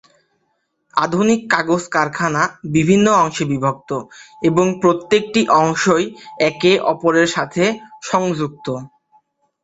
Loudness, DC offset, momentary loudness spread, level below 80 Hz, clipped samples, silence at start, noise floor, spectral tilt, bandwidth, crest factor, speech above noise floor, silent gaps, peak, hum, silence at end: -17 LUFS; under 0.1%; 10 LU; -54 dBFS; under 0.1%; 0.95 s; -68 dBFS; -5 dB/octave; 8.2 kHz; 16 dB; 52 dB; none; 0 dBFS; none; 0.75 s